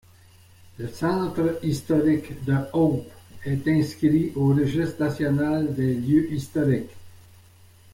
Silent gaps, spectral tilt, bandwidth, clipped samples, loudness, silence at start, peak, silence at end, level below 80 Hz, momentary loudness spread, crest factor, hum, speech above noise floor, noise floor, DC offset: none; -8 dB/octave; 16.5 kHz; under 0.1%; -24 LUFS; 0.8 s; -10 dBFS; 0.75 s; -52 dBFS; 7 LU; 14 dB; none; 29 dB; -52 dBFS; under 0.1%